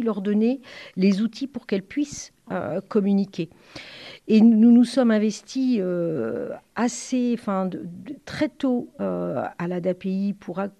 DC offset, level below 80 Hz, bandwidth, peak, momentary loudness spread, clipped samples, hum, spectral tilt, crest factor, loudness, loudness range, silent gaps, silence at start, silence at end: under 0.1%; -64 dBFS; 10.5 kHz; -6 dBFS; 18 LU; under 0.1%; none; -6.5 dB/octave; 16 dB; -23 LUFS; 7 LU; none; 0 s; 0.1 s